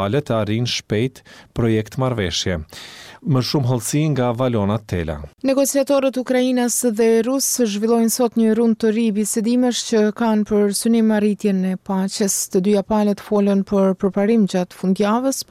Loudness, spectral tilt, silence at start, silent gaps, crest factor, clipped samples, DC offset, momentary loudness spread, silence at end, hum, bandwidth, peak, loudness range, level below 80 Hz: -18 LUFS; -5 dB/octave; 0 s; none; 10 dB; under 0.1%; under 0.1%; 6 LU; 0.05 s; none; 16 kHz; -8 dBFS; 4 LU; -46 dBFS